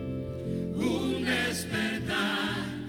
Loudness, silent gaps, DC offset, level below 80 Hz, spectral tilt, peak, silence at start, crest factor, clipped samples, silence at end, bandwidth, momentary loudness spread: -30 LUFS; none; under 0.1%; -54 dBFS; -4.5 dB/octave; -16 dBFS; 0 s; 14 dB; under 0.1%; 0 s; 19 kHz; 7 LU